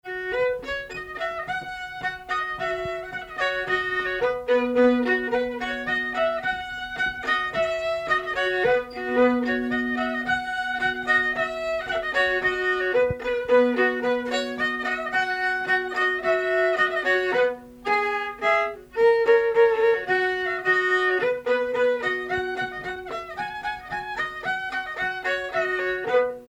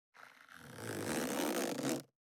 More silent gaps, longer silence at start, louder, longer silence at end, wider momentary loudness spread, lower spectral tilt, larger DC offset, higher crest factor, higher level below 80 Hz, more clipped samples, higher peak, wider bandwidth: neither; about the same, 0.05 s vs 0.15 s; first, -24 LUFS vs -38 LUFS; second, 0.05 s vs 0.2 s; second, 10 LU vs 20 LU; about the same, -4.5 dB/octave vs -3.5 dB/octave; neither; second, 16 dB vs 22 dB; first, -54 dBFS vs -78 dBFS; neither; first, -8 dBFS vs -18 dBFS; second, 12 kHz vs over 20 kHz